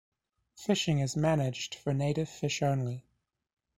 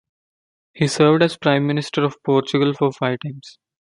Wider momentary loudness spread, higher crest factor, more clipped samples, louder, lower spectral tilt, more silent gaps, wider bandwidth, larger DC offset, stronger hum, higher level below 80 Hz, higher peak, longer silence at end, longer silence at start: about the same, 8 LU vs 9 LU; about the same, 18 dB vs 18 dB; neither; second, -31 LUFS vs -19 LUFS; about the same, -5.5 dB/octave vs -6 dB/octave; neither; first, 13 kHz vs 11.5 kHz; neither; neither; about the same, -60 dBFS vs -62 dBFS; second, -14 dBFS vs -2 dBFS; first, 0.8 s vs 0.45 s; second, 0.6 s vs 0.75 s